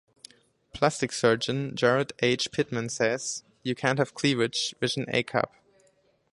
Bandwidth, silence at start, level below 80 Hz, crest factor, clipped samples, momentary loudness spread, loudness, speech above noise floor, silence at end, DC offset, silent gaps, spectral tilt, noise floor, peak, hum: 11.5 kHz; 0.75 s; -64 dBFS; 22 dB; under 0.1%; 7 LU; -27 LUFS; 39 dB; 0.85 s; under 0.1%; none; -4 dB/octave; -66 dBFS; -6 dBFS; none